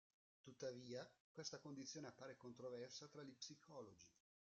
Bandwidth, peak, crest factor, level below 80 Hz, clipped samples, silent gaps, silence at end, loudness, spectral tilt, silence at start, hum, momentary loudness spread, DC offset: 8 kHz; -36 dBFS; 22 dB; under -90 dBFS; under 0.1%; 1.20-1.35 s; 0.5 s; -56 LUFS; -4 dB/octave; 0.45 s; none; 8 LU; under 0.1%